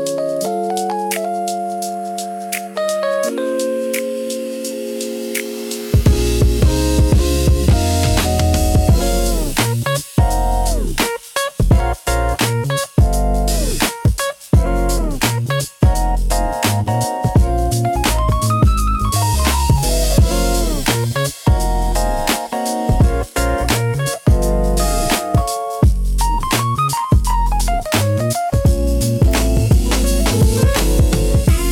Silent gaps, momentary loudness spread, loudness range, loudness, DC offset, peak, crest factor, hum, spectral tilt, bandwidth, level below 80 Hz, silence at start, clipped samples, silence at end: none; 6 LU; 5 LU; -17 LUFS; under 0.1%; -2 dBFS; 12 dB; none; -5 dB/octave; 17.5 kHz; -18 dBFS; 0 s; under 0.1%; 0 s